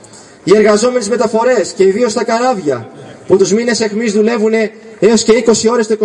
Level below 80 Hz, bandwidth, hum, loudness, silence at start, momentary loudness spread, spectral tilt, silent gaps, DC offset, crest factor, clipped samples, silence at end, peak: -52 dBFS; 11 kHz; none; -12 LUFS; 0.15 s; 7 LU; -4 dB/octave; none; under 0.1%; 12 dB; under 0.1%; 0 s; 0 dBFS